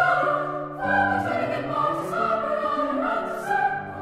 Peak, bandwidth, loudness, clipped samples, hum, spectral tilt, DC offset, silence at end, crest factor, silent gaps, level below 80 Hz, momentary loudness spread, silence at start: -8 dBFS; 15.5 kHz; -24 LUFS; under 0.1%; none; -6 dB/octave; under 0.1%; 0 s; 16 dB; none; -56 dBFS; 5 LU; 0 s